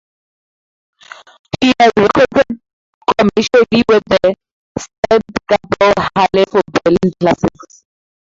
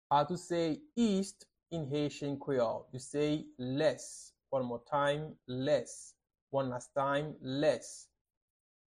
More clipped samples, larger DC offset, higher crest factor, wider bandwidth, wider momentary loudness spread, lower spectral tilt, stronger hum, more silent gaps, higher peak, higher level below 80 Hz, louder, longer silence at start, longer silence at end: neither; neither; about the same, 14 dB vs 18 dB; second, 7.8 kHz vs 12.5 kHz; about the same, 11 LU vs 11 LU; about the same, -5.5 dB/octave vs -5.5 dB/octave; neither; first, 2.73-3.01 s, 4.51-4.75 s, 4.98-5.03 s vs 6.42-6.47 s; first, 0 dBFS vs -16 dBFS; first, -44 dBFS vs -68 dBFS; first, -13 LUFS vs -35 LUFS; first, 1.6 s vs 0.1 s; about the same, 0.9 s vs 0.9 s